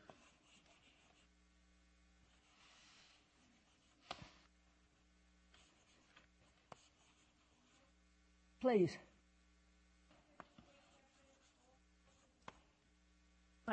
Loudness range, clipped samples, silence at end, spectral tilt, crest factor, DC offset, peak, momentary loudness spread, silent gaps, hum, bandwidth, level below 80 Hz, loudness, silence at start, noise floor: 24 LU; under 0.1%; 0 s; -6.5 dB/octave; 26 dB; under 0.1%; -24 dBFS; 28 LU; none; none; 8.4 kHz; -76 dBFS; -41 LUFS; 4.1 s; -74 dBFS